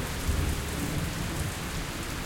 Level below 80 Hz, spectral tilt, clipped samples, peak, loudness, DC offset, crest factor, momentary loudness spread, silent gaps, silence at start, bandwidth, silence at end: -36 dBFS; -4.5 dB/octave; under 0.1%; -16 dBFS; -32 LUFS; under 0.1%; 14 dB; 4 LU; none; 0 s; 17 kHz; 0 s